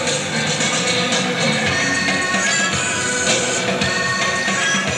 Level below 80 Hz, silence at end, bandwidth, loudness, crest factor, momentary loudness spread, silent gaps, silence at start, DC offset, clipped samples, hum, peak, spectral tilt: -52 dBFS; 0 s; 15.5 kHz; -17 LUFS; 14 dB; 2 LU; none; 0 s; under 0.1%; under 0.1%; none; -4 dBFS; -2 dB/octave